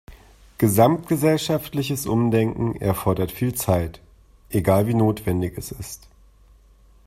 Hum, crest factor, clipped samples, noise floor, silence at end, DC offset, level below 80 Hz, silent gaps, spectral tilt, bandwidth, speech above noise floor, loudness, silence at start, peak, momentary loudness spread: none; 20 dB; under 0.1%; -52 dBFS; 1.1 s; under 0.1%; -46 dBFS; none; -6.5 dB/octave; 16 kHz; 32 dB; -22 LUFS; 0.1 s; -2 dBFS; 13 LU